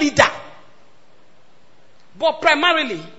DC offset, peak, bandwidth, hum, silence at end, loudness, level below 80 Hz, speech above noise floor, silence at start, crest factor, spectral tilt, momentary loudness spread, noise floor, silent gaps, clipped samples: 0.9%; 0 dBFS; 10 kHz; none; 0.1 s; -17 LUFS; -54 dBFS; 38 dB; 0 s; 20 dB; -3 dB/octave; 7 LU; -55 dBFS; none; under 0.1%